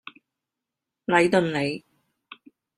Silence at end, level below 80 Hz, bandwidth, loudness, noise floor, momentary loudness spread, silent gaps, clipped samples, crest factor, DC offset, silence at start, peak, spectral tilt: 1 s; -64 dBFS; 11.5 kHz; -22 LUFS; -86 dBFS; 17 LU; none; under 0.1%; 22 dB; under 0.1%; 1.1 s; -6 dBFS; -5.5 dB/octave